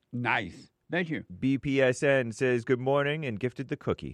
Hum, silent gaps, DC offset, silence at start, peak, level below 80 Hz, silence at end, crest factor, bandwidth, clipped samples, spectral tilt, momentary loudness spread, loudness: none; none; under 0.1%; 0.15 s; -12 dBFS; -60 dBFS; 0 s; 18 dB; 11 kHz; under 0.1%; -6 dB/octave; 8 LU; -29 LUFS